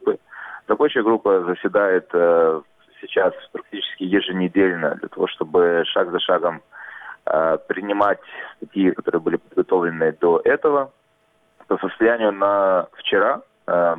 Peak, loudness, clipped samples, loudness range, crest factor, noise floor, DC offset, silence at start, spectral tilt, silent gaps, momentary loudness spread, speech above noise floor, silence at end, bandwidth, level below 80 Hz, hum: -4 dBFS; -20 LUFS; under 0.1%; 2 LU; 16 dB; -62 dBFS; under 0.1%; 0 s; -8 dB/octave; none; 12 LU; 43 dB; 0 s; 3.9 kHz; -62 dBFS; none